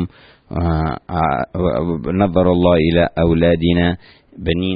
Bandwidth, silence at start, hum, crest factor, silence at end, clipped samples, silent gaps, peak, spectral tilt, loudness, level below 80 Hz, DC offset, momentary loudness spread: 5 kHz; 0 s; none; 14 dB; 0 s; under 0.1%; none; -2 dBFS; -12.5 dB/octave; -17 LUFS; -32 dBFS; under 0.1%; 9 LU